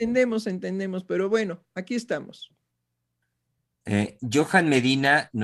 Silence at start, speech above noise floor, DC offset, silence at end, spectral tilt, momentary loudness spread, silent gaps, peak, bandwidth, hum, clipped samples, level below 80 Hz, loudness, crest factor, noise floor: 0 s; 55 dB; under 0.1%; 0 s; -5 dB/octave; 12 LU; none; -6 dBFS; 12.5 kHz; 60 Hz at -60 dBFS; under 0.1%; -64 dBFS; -24 LUFS; 20 dB; -79 dBFS